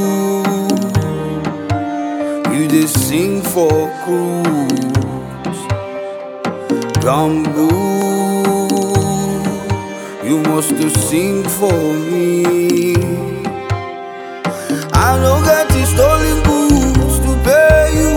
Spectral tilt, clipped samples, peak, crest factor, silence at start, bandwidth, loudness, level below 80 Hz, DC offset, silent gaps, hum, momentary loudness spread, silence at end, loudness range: -5.5 dB/octave; under 0.1%; 0 dBFS; 14 dB; 0 s; 19.5 kHz; -15 LUFS; -26 dBFS; under 0.1%; none; none; 11 LU; 0 s; 5 LU